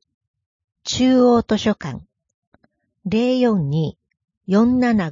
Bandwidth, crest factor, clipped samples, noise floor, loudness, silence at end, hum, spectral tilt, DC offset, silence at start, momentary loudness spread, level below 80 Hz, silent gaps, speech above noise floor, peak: 7.6 kHz; 14 dB; under 0.1%; -61 dBFS; -18 LUFS; 0 s; none; -6 dB/octave; under 0.1%; 0.85 s; 18 LU; -50 dBFS; 2.34-2.52 s, 4.37-4.41 s; 45 dB; -4 dBFS